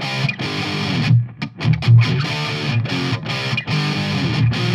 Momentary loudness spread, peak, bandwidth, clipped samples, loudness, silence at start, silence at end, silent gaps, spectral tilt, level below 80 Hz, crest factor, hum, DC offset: 8 LU; -2 dBFS; 9.6 kHz; under 0.1%; -18 LUFS; 0 s; 0 s; none; -6 dB/octave; -46 dBFS; 16 dB; none; under 0.1%